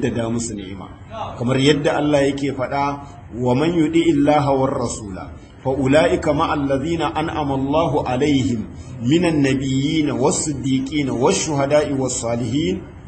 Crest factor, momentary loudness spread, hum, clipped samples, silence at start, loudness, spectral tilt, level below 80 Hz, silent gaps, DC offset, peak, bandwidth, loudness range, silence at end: 18 dB; 12 LU; none; under 0.1%; 0 s; -19 LUFS; -5.5 dB/octave; -42 dBFS; none; under 0.1%; 0 dBFS; 8.8 kHz; 2 LU; 0 s